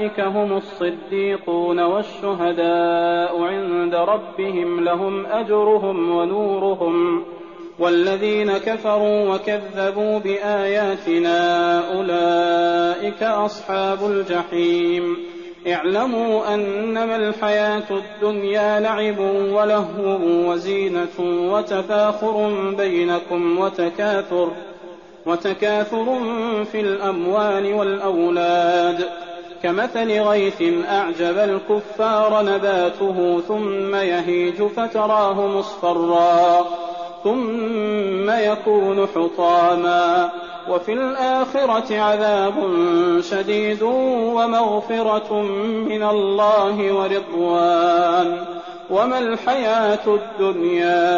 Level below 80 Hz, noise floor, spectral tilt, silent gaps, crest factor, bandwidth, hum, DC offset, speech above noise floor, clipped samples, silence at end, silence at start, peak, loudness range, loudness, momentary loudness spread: -62 dBFS; -39 dBFS; -3.5 dB/octave; none; 12 dB; 7.2 kHz; none; 0.2%; 21 dB; under 0.1%; 0 s; 0 s; -6 dBFS; 3 LU; -19 LUFS; 6 LU